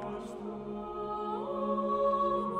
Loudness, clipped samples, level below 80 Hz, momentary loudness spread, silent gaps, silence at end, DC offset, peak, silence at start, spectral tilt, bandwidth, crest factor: -34 LUFS; under 0.1%; -60 dBFS; 12 LU; none; 0 s; under 0.1%; -18 dBFS; 0 s; -7.5 dB/octave; 10.5 kHz; 14 dB